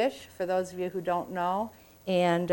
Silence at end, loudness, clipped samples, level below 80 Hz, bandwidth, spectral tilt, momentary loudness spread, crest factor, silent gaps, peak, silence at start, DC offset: 0 s; -30 LUFS; under 0.1%; -66 dBFS; 17 kHz; -6 dB/octave; 10 LU; 16 dB; none; -12 dBFS; 0 s; under 0.1%